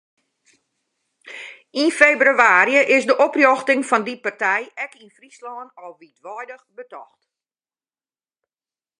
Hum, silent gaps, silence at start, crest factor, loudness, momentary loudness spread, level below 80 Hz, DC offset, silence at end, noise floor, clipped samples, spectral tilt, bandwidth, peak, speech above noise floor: none; none; 1.25 s; 20 dB; -16 LUFS; 24 LU; -74 dBFS; under 0.1%; 1.95 s; under -90 dBFS; under 0.1%; -3 dB/octave; 11 kHz; 0 dBFS; over 71 dB